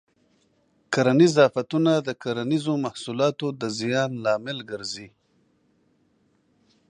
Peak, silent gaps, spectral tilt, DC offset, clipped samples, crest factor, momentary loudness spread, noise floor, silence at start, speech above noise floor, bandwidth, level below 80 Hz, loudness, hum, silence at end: -6 dBFS; none; -5.5 dB/octave; under 0.1%; under 0.1%; 20 dB; 14 LU; -66 dBFS; 0.9 s; 43 dB; 10.5 kHz; -70 dBFS; -23 LUFS; none; 1.85 s